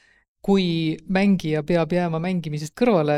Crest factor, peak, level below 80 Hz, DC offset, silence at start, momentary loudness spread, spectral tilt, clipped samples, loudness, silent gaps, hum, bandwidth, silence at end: 16 dB; -6 dBFS; -50 dBFS; under 0.1%; 0.45 s; 6 LU; -7 dB/octave; under 0.1%; -22 LUFS; none; none; 12 kHz; 0 s